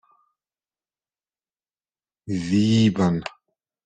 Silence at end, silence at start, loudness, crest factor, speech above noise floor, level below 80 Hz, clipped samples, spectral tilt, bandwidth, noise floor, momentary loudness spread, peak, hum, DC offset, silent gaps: 0.55 s; 2.25 s; -21 LUFS; 18 dB; over 70 dB; -58 dBFS; under 0.1%; -6.5 dB/octave; 9.2 kHz; under -90 dBFS; 12 LU; -8 dBFS; none; under 0.1%; none